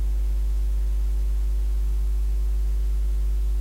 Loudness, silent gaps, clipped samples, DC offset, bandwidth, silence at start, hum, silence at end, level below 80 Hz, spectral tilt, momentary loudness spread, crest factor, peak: -27 LUFS; none; under 0.1%; under 0.1%; 5.2 kHz; 0 s; none; 0 s; -22 dBFS; -6.5 dB/octave; 0 LU; 4 dB; -18 dBFS